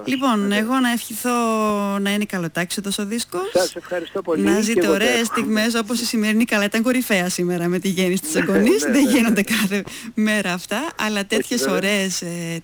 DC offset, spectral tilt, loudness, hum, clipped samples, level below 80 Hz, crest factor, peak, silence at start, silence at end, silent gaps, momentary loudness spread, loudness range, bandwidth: under 0.1%; -4 dB/octave; -20 LUFS; none; under 0.1%; -56 dBFS; 12 dB; -8 dBFS; 0 s; 0 s; none; 7 LU; 3 LU; over 20 kHz